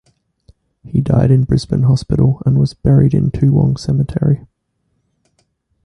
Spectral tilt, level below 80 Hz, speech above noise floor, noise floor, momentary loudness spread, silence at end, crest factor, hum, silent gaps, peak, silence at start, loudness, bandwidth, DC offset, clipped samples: -9 dB/octave; -34 dBFS; 54 dB; -67 dBFS; 5 LU; 1.45 s; 14 dB; none; none; -2 dBFS; 0.85 s; -14 LUFS; 10 kHz; under 0.1%; under 0.1%